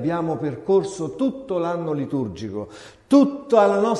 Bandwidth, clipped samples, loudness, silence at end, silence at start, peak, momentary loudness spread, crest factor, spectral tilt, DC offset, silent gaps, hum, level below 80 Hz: 11 kHz; under 0.1%; -22 LUFS; 0 s; 0 s; -2 dBFS; 13 LU; 18 dB; -7 dB/octave; under 0.1%; none; none; -56 dBFS